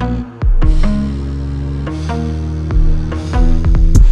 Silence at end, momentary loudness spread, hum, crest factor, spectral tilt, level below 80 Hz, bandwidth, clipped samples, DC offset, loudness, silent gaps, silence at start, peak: 0 s; 7 LU; none; 12 dB; -7.5 dB/octave; -12 dBFS; 8.4 kHz; 0.2%; 0.9%; -17 LUFS; none; 0 s; 0 dBFS